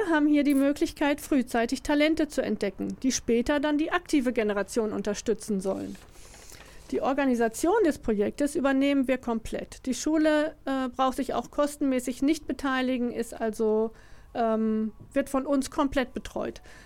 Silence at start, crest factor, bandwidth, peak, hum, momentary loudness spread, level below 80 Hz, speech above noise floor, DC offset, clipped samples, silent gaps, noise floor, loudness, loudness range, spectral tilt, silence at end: 0 s; 16 dB; 16.5 kHz; -10 dBFS; none; 9 LU; -50 dBFS; 21 dB; under 0.1%; under 0.1%; none; -47 dBFS; -27 LUFS; 3 LU; -4.5 dB/octave; 0 s